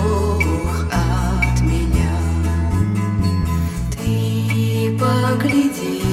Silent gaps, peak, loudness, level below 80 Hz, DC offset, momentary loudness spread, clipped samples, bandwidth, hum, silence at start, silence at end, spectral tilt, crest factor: none; -4 dBFS; -19 LUFS; -24 dBFS; under 0.1%; 4 LU; under 0.1%; 15.5 kHz; none; 0 s; 0 s; -6.5 dB/octave; 14 dB